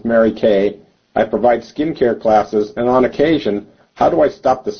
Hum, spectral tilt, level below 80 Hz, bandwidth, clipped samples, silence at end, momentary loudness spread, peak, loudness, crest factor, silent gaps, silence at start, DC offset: none; -7 dB/octave; -46 dBFS; 6.6 kHz; under 0.1%; 0 s; 7 LU; -2 dBFS; -16 LUFS; 12 dB; none; 0.05 s; under 0.1%